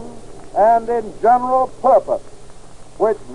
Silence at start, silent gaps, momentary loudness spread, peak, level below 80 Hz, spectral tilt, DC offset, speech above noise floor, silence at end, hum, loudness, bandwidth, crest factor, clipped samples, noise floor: 0 s; none; 11 LU; -4 dBFS; -44 dBFS; -6 dB/octave; 2%; 24 dB; 0 s; none; -17 LUFS; 10.5 kHz; 14 dB; under 0.1%; -39 dBFS